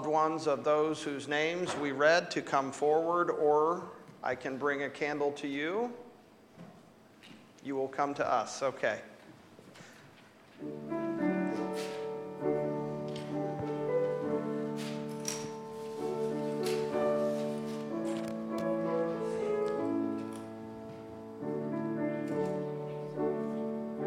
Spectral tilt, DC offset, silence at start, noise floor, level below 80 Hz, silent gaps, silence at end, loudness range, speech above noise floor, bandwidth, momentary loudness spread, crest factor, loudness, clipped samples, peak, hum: -5 dB/octave; under 0.1%; 0 s; -58 dBFS; -76 dBFS; none; 0 s; 7 LU; 27 dB; 15.5 kHz; 15 LU; 20 dB; -33 LUFS; under 0.1%; -14 dBFS; none